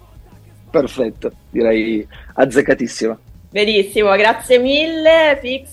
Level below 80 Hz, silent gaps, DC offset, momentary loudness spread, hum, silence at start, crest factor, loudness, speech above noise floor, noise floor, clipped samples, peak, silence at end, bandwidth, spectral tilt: -44 dBFS; none; under 0.1%; 11 LU; none; 0.15 s; 16 dB; -15 LUFS; 27 dB; -42 dBFS; under 0.1%; 0 dBFS; 0 s; 16 kHz; -4 dB/octave